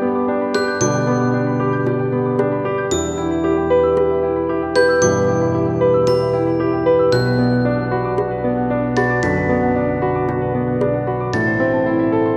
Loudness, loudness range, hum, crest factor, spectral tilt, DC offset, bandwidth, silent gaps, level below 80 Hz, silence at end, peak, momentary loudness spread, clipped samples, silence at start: -17 LUFS; 2 LU; none; 14 dB; -6 dB/octave; under 0.1%; 9.4 kHz; none; -42 dBFS; 0 s; -2 dBFS; 5 LU; under 0.1%; 0 s